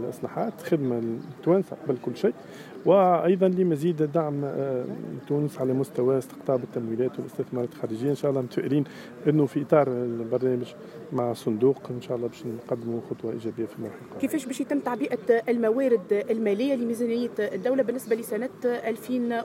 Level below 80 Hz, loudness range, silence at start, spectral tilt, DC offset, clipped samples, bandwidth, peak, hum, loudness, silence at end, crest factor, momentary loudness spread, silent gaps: -74 dBFS; 5 LU; 0 s; -7.5 dB/octave; under 0.1%; under 0.1%; 16 kHz; -6 dBFS; none; -27 LUFS; 0 s; 20 dB; 10 LU; none